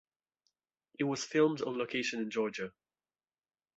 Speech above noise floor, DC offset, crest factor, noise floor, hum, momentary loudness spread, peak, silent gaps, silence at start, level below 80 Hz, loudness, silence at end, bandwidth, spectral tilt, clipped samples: over 57 dB; under 0.1%; 20 dB; under -90 dBFS; none; 8 LU; -16 dBFS; none; 1 s; -80 dBFS; -34 LUFS; 1.05 s; 8 kHz; -4 dB/octave; under 0.1%